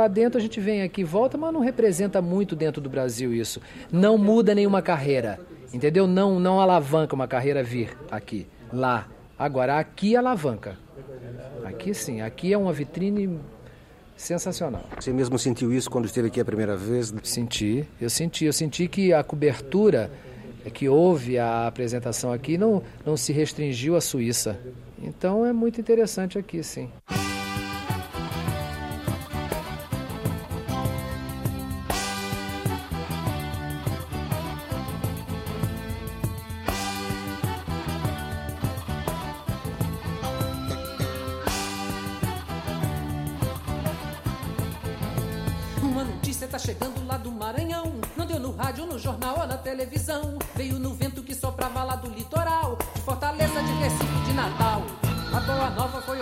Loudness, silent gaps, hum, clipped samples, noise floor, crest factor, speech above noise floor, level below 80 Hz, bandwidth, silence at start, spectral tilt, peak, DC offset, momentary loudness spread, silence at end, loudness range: -26 LUFS; none; none; under 0.1%; -49 dBFS; 18 dB; 25 dB; -44 dBFS; 16 kHz; 0 s; -5.5 dB/octave; -8 dBFS; under 0.1%; 11 LU; 0 s; 8 LU